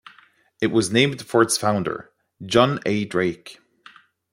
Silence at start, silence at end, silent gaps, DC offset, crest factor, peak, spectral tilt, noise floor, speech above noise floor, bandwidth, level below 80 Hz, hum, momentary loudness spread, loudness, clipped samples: 0.6 s; 0.8 s; none; under 0.1%; 20 dB; -2 dBFS; -4.5 dB/octave; -55 dBFS; 34 dB; 16 kHz; -60 dBFS; none; 12 LU; -21 LUFS; under 0.1%